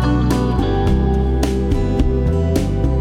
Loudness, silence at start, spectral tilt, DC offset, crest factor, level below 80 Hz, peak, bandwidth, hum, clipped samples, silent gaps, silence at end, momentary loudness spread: -18 LUFS; 0 s; -7.5 dB/octave; under 0.1%; 12 dB; -20 dBFS; -2 dBFS; 14.5 kHz; none; under 0.1%; none; 0 s; 2 LU